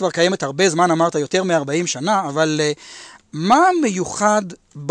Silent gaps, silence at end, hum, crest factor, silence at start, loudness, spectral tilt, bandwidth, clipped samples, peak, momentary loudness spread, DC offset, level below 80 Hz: none; 0 s; none; 14 dB; 0 s; -18 LUFS; -4 dB/octave; 11 kHz; under 0.1%; -4 dBFS; 16 LU; under 0.1%; -60 dBFS